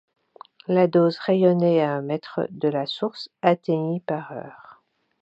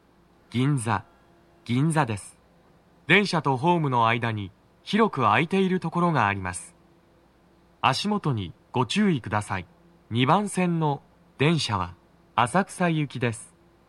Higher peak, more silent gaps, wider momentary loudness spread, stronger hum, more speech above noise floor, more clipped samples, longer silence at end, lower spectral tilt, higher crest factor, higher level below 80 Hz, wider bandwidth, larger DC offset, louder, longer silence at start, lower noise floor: about the same, -2 dBFS vs -4 dBFS; neither; about the same, 12 LU vs 12 LU; neither; about the same, 35 dB vs 35 dB; neither; about the same, 0.5 s vs 0.45 s; first, -8.5 dB/octave vs -5.5 dB/octave; about the same, 22 dB vs 22 dB; second, -74 dBFS vs -62 dBFS; second, 7.8 kHz vs 13 kHz; neither; about the same, -23 LUFS vs -25 LUFS; first, 0.7 s vs 0.5 s; about the same, -57 dBFS vs -59 dBFS